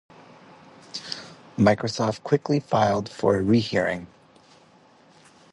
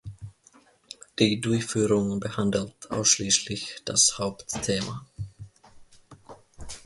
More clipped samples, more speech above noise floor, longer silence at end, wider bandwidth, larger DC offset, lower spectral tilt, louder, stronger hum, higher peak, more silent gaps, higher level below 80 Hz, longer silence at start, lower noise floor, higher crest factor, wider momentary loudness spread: neither; about the same, 33 dB vs 33 dB; first, 1.45 s vs 0.05 s; about the same, 11 kHz vs 11.5 kHz; neither; first, -6 dB/octave vs -3 dB/octave; about the same, -23 LUFS vs -25 LUFS; neither; about the same, -4 dBFS vs -6 dBFS; neither; about the same, -54 dBFS vs -54 dBFS; first, 0.95 s vs 0.05 s; second, -55 dBFS vs -59 dBFS; about the same, 22 dB vs 22 dB; second, 15 LU vs 22 LU